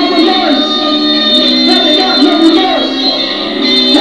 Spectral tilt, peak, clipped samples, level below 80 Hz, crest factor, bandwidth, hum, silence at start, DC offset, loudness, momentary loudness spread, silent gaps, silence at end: -3 dB/octave; 0 dBFS; 0.4%; -48 dBFS; 10 dB; 11 kHz; none; 0 s; 0.7%; -8 LUFS; 4 LU; none; 0 s